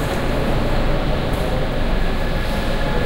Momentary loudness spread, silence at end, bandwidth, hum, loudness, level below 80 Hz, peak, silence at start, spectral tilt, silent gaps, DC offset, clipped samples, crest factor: 2 LU; 0 s; 16.5 kHz; none; -22 LUFS; -20 dBFS; -6 dBFS; 0 s; -6 dB/octave; none; under 0.1%; under 0.1%; 12 dB